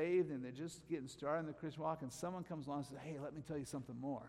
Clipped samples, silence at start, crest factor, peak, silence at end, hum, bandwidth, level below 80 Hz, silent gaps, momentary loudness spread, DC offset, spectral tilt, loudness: under 0.1%; 0 s; 16 dB; -28 dBFS; 0 s; none; 15 kHz; -74 dBFS; none; 6 LU; under 0.1%; -6.5 dB/octave; -45 LUFS